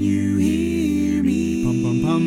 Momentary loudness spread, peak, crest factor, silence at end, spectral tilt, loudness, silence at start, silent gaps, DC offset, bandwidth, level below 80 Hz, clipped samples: 1 LU; -8 dBFS; 10 dB; 0 s; -7 dB/octave; -20 LUFS; 0 s; none; under 0.1%; 15.5 kHz; -38 dBFS; under 0.1%